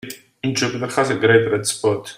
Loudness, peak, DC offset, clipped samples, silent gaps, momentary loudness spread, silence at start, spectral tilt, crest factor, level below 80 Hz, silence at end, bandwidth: -19 LUFS; 0 dBFS; under 0.1%; under 0.1%; none; 10 LU; 0.05 s; -4 dB/octave; 18 dB; -60 dBFS; 0.05 s; 16 kHz